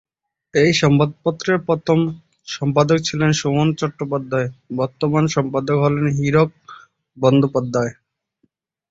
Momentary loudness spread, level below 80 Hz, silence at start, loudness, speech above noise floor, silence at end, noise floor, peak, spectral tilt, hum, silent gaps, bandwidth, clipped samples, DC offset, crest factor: 9 LU; -52 dBFS; 0.55 s; -18 LUFS; 49 dB; 1 s; -67 dBFS; -2 dBFS; -6 dB/octave; none; none; 7.8 kHz; under 0.1%; under 0.1%; 16 dB